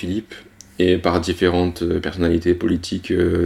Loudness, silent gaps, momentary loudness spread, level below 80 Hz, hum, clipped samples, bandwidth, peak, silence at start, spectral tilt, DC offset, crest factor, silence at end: -20 LUFS; none; 9 LU; -38 dBFS; none; under 0.1%; 13 kHz; -2 dBFS; 0 s; -6.5 dB/octave; under 0.1%; 18 dB; 0 s